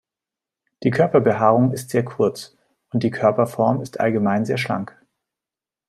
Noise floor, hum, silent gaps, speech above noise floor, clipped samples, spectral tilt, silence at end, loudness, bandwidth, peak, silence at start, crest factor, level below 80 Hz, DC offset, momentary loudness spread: -89 dBFS; none; none; 70 dB; under 0.1%; -7 dB/octave; 1.05 s; -20 LUFS; 14 kHz; -2 dBFS; 0.8 s; 18 dB; -62 dBFS; under 0.1%; 9 LU